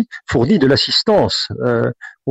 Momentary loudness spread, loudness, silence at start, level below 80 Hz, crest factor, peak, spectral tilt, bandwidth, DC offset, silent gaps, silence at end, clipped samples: 7 LU; -15 LUFS; 0 s; -44 dBFS; 12 dB; -4 dBFS; -5.5 dB/octave; 8.4 kHz; under 0.1%; none; 0 s; under 0.1%